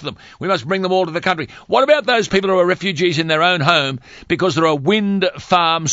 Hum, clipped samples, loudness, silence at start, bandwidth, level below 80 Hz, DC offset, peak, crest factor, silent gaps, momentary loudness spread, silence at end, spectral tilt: none; under 0.1%; -16 LUFS; 0 s; 8 kHz; -52 dBFS; under 0.1%; 0 dBFS; 16 dB; none; 8 LU; 0 s; -4.5 dB/octave